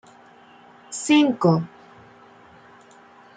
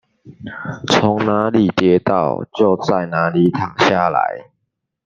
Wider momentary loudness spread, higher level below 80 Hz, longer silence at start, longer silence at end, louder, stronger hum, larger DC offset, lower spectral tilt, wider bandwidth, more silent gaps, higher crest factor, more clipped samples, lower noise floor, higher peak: first, 18 LU vs 14 LU; second, -70 dBFS vs -54 dBFS; first, 0.9 s vs 0.25 s; first, 1.7 s vs 0.65 s; second, -20 LUFS vs -16 LUFS; neither; neither; about the same, -5.5 dB/octave vs -6 dB/octave; first, 9.4 kHz vs 7.6 kHz; neither; about the same, 20 dB vs 16 dB; neither; second, -50 dBFS vs -74 dBFS; second, -6 dBFS vs 0 dBFS